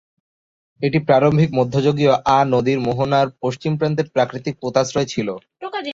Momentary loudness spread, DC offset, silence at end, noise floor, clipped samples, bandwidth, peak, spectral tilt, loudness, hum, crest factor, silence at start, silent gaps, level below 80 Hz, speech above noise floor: 10 LU; under 0.1%; 0 s; under -90 dBFS; under 0.1%; 7.8 kHz; -2 dBFS; -6.5 dB/octave; -18 LUFS; none; 16 dB; 0.8 s; none; -52 dBFS; over 72 dB